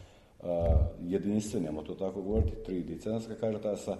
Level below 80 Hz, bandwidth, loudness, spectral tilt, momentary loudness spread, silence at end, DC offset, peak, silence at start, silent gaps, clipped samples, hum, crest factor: -38 dBFS; 12 kHz; -33 LUFS; -7.5 dB/octave; 8 LU; 0 s; under 0.1%; -16 dBFS; 0 s; none; under 0.1%; none; 16 dB